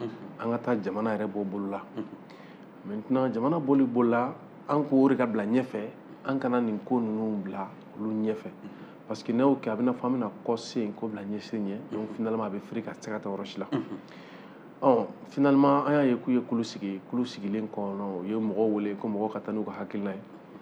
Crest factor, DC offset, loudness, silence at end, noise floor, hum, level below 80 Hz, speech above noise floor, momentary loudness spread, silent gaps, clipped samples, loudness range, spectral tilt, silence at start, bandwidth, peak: 20 dB; under 0.1%; -29 LUFS; 0 s; -48 dBFS; none; -80 dBFS; 19 dB; 16 LU; none; under 0.1%; 7 LU; -7.5 dB/octave; 0 s; 8.6 kHz; -8 dBFS